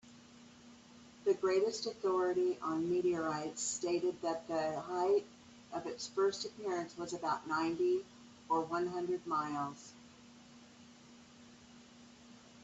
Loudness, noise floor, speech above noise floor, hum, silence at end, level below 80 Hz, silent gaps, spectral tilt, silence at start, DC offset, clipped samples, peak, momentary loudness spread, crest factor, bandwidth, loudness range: -36 LUFS; -59 dBFS; 23 dB; none; 0 s; -76 dBFS; none; -4 dB/octave; 0.05 s; under 0.1%; under 0.1%; -22 dBFS; 24 LU; 16 dB; 8.4 kHz; 7 LU